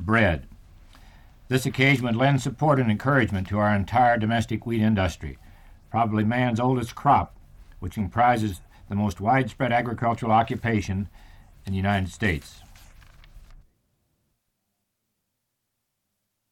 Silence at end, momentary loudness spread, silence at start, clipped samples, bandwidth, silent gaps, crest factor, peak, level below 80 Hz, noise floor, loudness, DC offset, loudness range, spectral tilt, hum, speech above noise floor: 2.95 s; 12 LU; 0 s; under 0.1%; 15.5 kHz; none; 18 dB; -6 dBFS; -46 dBFS; -79 dBFS; -24 LUFS; under 0.1%; 9 LU; -6.5 dB/octave; none; 56 dB